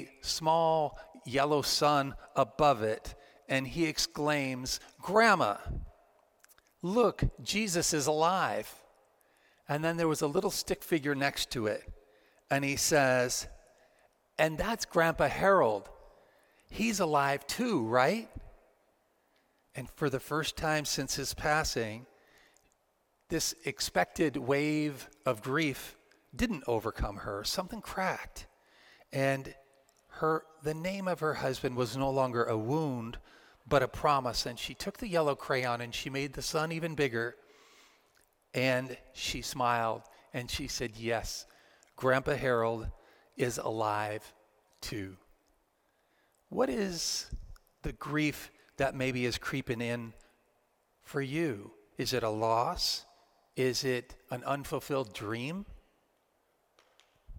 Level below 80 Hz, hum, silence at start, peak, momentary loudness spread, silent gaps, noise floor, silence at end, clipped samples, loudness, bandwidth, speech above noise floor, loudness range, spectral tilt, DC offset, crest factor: -52 dBFS; none; 0 s; -10 dBFS; 14 LU; none; -74 dBFS; 0 s; under 0.1%; -32 LUFS; 17 kHz; 43 dB; 6 LU; -4 dB/octave; under 0.1%; 22 dB